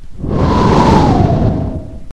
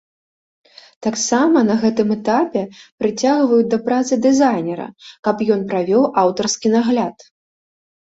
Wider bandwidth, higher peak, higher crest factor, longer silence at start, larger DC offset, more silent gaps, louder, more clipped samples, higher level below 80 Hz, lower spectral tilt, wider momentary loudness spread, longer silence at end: first, 10.5 kHz vs 8 kHz; about the same, 0 dBFS vs -2 dBFS; about the same, 12 dB vs 16 dB; second, 0 s vs 1 s; neither; second, none vs 2.92-2.98 s, 5.19-5.23 s; first, -12 LUFS vs -17 LUFS; first, 0.3% vs under 0.1%; first, -22 dBFS vs -60 dBFS; first, -7.5 dB/octave vs -4.5 dB/octave; about the same, 12 LU vs 10 LU; second, 0.05 s vs 1 s